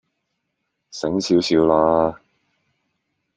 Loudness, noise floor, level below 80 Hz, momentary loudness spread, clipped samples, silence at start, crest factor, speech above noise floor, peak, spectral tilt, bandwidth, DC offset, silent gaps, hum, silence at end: -18 LUFS; -76 dBFS; -52 dBFS; 11 LU; under 0.1%; 0.95 s; 20 dB; 59 dB; -2 dBFS; -5.5 dB/octave; 9.4 kHz; under 0.1%; none; none; 1.2 s